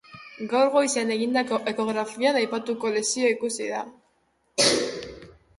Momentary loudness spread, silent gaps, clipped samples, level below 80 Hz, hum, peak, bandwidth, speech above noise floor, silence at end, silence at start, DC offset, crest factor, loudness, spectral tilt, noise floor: 14 LU; none; under 0.1%; -64 dBFS; none; -8 dBFS; 11.5 kHz; 44 dB; 0.25 s; 0.1 s; under 0.1%; 18 dB; -24 LUFS; -2.5 dB/octave; -68 dBFS